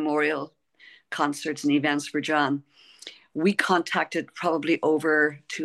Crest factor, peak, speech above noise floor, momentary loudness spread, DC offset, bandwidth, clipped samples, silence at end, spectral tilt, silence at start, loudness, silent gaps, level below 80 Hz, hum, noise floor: 18 dB; -6 dBFS; 30 dB; 14 LU; under 0.1%; 12.5 kHz; under 0.1%; 0 s; -4.5 dB/octave; 0 s; -25 LUFS; none; -76 dBFS; none; -54 dBFS